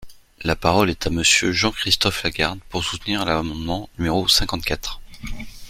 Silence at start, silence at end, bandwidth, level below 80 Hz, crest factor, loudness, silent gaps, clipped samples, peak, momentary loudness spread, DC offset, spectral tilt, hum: 0 s; 0 s; 16 kHz; -36 dBFS; 20 dB; -20 LUFS; none; under 0.1%; -2 dBFS; 13 LU; under 0.1%; -3 dB/octave; none